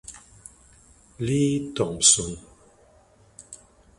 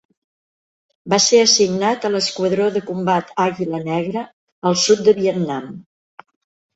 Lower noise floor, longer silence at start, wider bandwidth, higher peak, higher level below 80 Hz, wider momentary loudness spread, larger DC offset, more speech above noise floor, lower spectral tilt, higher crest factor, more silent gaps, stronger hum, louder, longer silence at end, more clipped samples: second, -57 dBFS vs under -90 dBFS; second, 0.1 s vs 1.05 s; first, 11.5 kHz vs 8.2 kHz; about the same, -4 dBFS vs -2 dBFS; first, -52 dBFS vs -62 dBFS; first, 27 LU vs 12 LU; neither; second, 34 dB vs over 73 dB; about the same, -3 dB/octave vs -3.5 dB/octave; first, 24 dB vs 18 dB; second, none vs 4.33-4.62 s; neither; second, -21 LUFS vs -17 LUFS; second, 0.45 s vs 0.95 s; neither